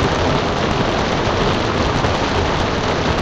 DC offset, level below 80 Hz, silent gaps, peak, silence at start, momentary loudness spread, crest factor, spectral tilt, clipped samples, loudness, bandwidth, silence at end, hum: under 0.1%; -28 dBFS; none; -4 dBFS; 0 s; 1 LU; 12 dB; -5 dB/octave; under 0.1%; -17 LUFS; 9.6 kHz; 0 s; none